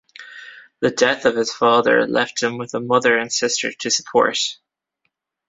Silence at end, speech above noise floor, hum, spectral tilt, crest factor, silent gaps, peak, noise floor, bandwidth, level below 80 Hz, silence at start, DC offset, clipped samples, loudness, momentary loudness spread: 0.95 s; 55 dB; none; -2.5 dB/octave; 18 dB; none; -2 dBFS; -74 dBFS; 8 kHz; -62 dBFS; 0.2 s; under 0.1%; under 0.1%; -18 LUFS; 10 LU